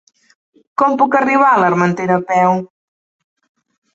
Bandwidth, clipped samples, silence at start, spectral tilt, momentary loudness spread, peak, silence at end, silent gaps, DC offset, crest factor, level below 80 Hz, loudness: 7.8 kHz; under 0.1%; 0.8 s; -7 dB/octave; 6 LU; -2 dBFS; 1.3 s; none; under 0.1%; 14 dB; -62 dBFS; -14 LUFS